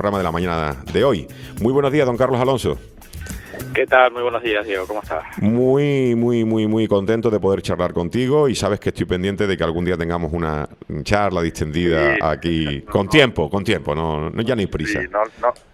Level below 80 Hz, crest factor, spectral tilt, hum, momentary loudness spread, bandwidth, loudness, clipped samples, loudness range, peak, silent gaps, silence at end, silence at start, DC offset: -40 dBFS; 18 dB; -6 dB/octave; none; 9 LU; 16 kHz; -19 LUFS; under 0.1%; 2 LU; 0 dBFS; none; 0.2 s; 0 s; under 0.1%